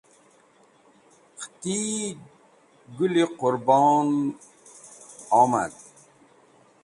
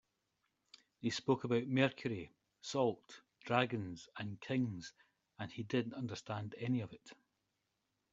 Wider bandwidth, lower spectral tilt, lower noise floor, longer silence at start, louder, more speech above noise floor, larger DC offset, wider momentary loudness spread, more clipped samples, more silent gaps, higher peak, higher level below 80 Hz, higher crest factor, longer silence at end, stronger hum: first, 11.5 kHz vs 7.8 kHz; about the same, -5 dB/octave vs -5 dB/octave; second, -58 dBFS vs -85 dBFS; first, 1.4 s vs 1 s; first, -23 LUFS vs -39 LUFS; second, 36 dB vs 47 dB; neither; first, 24 LU vs 16 LU; neither; neither; first, -6 dBFS vs -16 dBFS; first, -70 dBFS vs -76 dBFS; second, 20 dB vs 26 dB; about the same, 1.1 s vs 1 s; neither